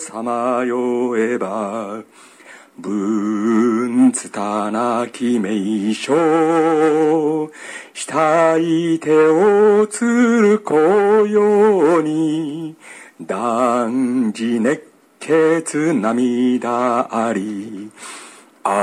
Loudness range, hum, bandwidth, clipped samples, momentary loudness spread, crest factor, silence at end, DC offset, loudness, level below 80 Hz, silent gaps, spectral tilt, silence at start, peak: 6 LU; none; 13 kHz; under 0.1%; 14 LU; 14 dB; 0 s; under 0.1%; -17 LUFS; -68 dBFS; none; -5.5 dB/octave; 0 s; -2 dBFS